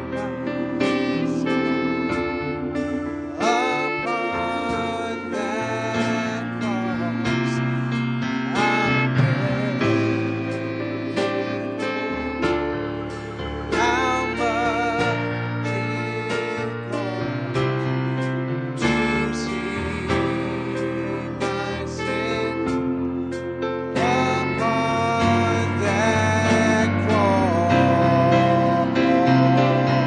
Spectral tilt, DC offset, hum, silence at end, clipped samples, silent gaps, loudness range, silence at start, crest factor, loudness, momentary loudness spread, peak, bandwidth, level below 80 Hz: -6 dB/octave; under 0.1%; none; 0 s; under 0.1%; none; 6 LU; 0 s; 16 dB; -22 LUFS; 9 LU; -6 dBFS; 10 kHz; -46 dBFS